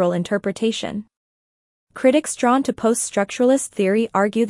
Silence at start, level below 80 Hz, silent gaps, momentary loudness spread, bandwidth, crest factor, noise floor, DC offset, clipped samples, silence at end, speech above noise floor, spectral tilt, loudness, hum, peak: 0 s; -62 dBFS; 1.17-1.87 s; 5 LU; 12 kHz; 16 dB; under -90 dBFS; under 0.1%; under 0.1%; 0 s; over 71 dB; -4.5 dB/octave; -20 LUFS; none; -4 dBFS